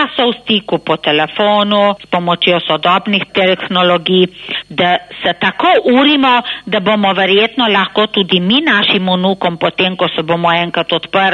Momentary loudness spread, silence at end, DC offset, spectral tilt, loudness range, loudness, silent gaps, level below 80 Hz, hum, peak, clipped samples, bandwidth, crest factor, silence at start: 5 LU; 0 s; under 0.1%; -6.5 dB/octave; 2 LU; -12 LUFS; none; -54 dBFS; none; 0 dBFS; under 0.1%; 9.2 kHz; 12 dB; 0 s